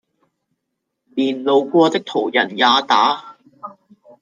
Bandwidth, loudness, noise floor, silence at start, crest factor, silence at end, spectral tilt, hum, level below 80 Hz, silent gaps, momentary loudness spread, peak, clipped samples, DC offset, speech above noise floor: 9.6 kHz; -16 LUFS; -77 dBFS; 1.15 s; 18 dB; 0.5 s; -4 dB/octave; none; -72 dBFS; none; 23 LU; -2 dBFS; under 0.1%; under 0.1%; 61 dB